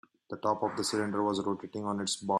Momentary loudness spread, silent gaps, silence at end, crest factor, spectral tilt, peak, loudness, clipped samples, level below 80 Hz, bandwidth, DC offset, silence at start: 5 LU; none; 0 s; 18 dB; -4 dB/octave; -16 dBFS; -32 LUFS; under 0.1%; -72 dBFS; 13 kHz; under 0.1%; 0.3 s